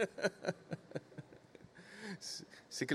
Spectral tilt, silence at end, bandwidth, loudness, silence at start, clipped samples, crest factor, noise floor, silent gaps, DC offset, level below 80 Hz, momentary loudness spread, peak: -4 dB/octave; 0 s; 15.5 kHz; -44 LUFS; 0 s; under 0.1%; 24 dB; -60 dBFS; none; under 0.1%; -82 dBFS; 20 LU; -20 dBFS